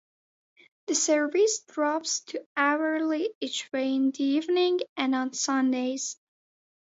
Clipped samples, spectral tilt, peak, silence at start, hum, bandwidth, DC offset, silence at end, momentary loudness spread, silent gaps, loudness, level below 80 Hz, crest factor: under 0.1%; -1 dB/octave; -10 dBFS; 0.9 s; none; 8 kHz; under 0.1%; 0.8 s; 8 LU; 2.46-2.55 s, 3.35-3.41 s, 4.89-4.96 s; -27 LUFS; -82 dBFS; 18 dB